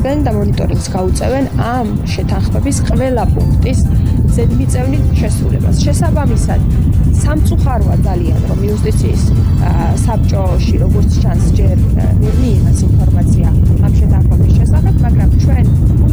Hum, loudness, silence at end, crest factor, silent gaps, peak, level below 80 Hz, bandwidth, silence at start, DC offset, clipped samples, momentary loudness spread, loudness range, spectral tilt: none; -12 LUFS; 0 s; 10 dB; none; 0 dBFS; -14 dBFS; over 20 kHz; 0 s; 2%; under 0.1%; 4 LU; 3 LU; -7.5 dB/octave